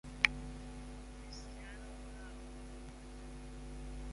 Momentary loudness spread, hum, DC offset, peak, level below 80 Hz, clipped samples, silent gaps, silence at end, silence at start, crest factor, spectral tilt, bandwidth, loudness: 18 LU; 60 Hz at -70 dBFS; under 0.1%; -8 dBFS; -50 dBFS; under 0.1%; none; 0 s; 0.05 s; 36 dB; -3.5 dB/octave; 11.5 kHz; -43 LUFS